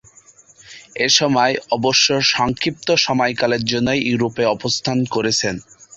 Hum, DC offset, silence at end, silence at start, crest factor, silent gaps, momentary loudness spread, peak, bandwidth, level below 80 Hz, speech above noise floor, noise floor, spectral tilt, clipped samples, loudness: none; under 0.1%; 0 s; 0.7 s; 18 dB; none; 6 LU; -2 dBFS; 8.2 kHz; -50 dBFS; 31 dB; -49 dBFS; -3 dB/octave; under 0.1%; -17 LUFS